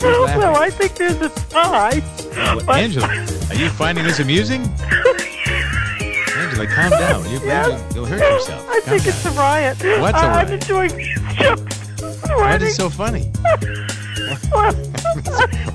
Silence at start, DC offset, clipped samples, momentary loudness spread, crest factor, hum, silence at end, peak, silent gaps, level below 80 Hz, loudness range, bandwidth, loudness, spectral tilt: 0 s; under 0.1%; under 0.1%; 8 LU; 16 dB; none; 0 s; -2 dBFS; none; -30 dBFS; 2 LU; 11 kHz; -17 LUFS; -5 dB/octave